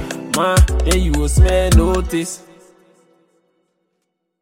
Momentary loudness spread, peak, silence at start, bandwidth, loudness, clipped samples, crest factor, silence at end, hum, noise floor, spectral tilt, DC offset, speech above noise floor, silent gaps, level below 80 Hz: 9 LU; -2 dBFS; 0 s; 16.5 kHz; -16 LUFS; under 0.1%; 16 dB; 2.05 s; none; -72 dBFS; -5 dB/octave; under 0.1%; 58 dB; none; -20 dBFS